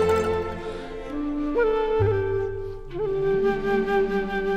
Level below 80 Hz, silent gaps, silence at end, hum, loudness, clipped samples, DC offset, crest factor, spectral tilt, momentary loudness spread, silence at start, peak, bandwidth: -40 dBFS; none; 0 s; none; -25 LUFS; under 0.1%; under 0.1%; 14 dB; -7 dB/octave; 11 LU; 0 s; -10 dBFS; 9.6 kHz